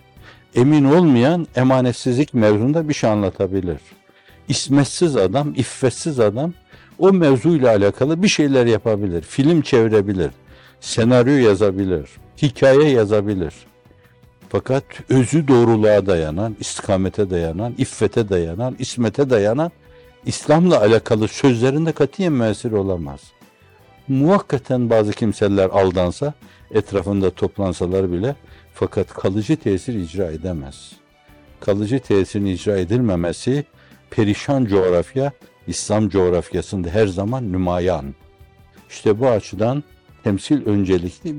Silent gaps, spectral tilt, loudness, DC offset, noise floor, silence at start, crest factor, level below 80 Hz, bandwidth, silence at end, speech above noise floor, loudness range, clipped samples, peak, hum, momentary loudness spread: none; -6.5 dB/octave; -18 LUFS; under 0.1%; -50 dBFS; 0.25 s; 14 dB; -48 dBFS; 11.5 kHz; 0 s; 33 dB; 5 LU; under 0.1%; -4 dBFS; none; 11 LU